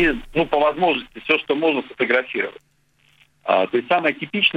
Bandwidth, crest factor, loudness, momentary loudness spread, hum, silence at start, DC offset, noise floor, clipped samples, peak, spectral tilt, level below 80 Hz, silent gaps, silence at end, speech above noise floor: 8.8 kHz; 18 dB; -20 LUFS; 7 LU; none; 0 s; under 0.1%; -58 dBFS; under 0.1%; -2 dBFS; -6 dB/octave; -46 dBFS; none; 0 s; 38 dB